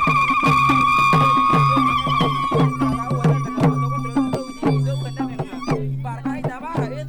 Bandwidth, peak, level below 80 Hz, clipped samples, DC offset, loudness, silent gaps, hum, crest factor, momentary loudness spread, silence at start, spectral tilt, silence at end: 16 kHz; -4 dBFS; -42 dBFS; under 0.1%; 0.2%; -19 LUFS; none; none; 14 dB; 12 LU; 0 s; -6.5 dB/octave; 0 s